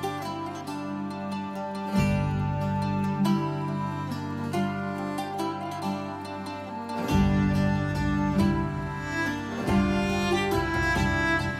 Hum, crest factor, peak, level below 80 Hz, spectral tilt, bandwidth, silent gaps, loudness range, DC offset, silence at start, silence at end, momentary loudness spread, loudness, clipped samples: none; 16 dB; -10 dBFS; -42 dBFS; -6.5 dB/octave; 15 kHz; none; 5 LU; under 0.1%; 0 s; 0 s; 9 LU; -28 LUFS; under 0.1%